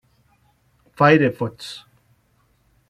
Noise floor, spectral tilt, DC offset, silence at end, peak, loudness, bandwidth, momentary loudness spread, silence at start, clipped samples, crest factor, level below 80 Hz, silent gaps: -62 dBFS; -7 dB/octave; under 0.1%; 1.1 s; -2 dBFS; -18 LUFS; 13 kHz; 20 LU; 1 s; under 0.1%; 20 dB; -60 dBFS; none